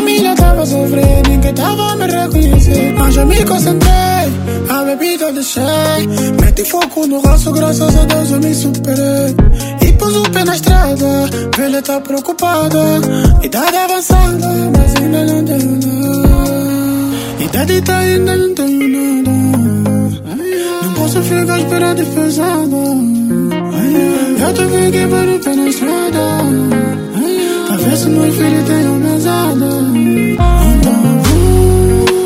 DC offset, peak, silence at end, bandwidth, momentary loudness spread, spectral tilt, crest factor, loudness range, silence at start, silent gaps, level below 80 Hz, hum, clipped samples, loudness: under 0.1%; 0 dBFS; 0 s; 16.5 kHz; 5 LU; -5.5 dB/octave; 10 dB; 2 LU; 0 s; none; -16 dBFS; none; 0.2%; -11 LUFS